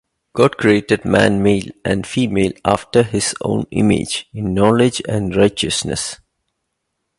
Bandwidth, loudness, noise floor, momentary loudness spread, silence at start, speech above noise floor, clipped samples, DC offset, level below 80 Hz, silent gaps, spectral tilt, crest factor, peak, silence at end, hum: 11.5 kHz; -17 LUFS; -74 dBFS; 9 LU; 0.35 s; 58 dB; under 0.1%; under 0.1%; -42 dBFS; none; -5 dB/octave; 16 dB; 0 dBFS; 1.05 s; none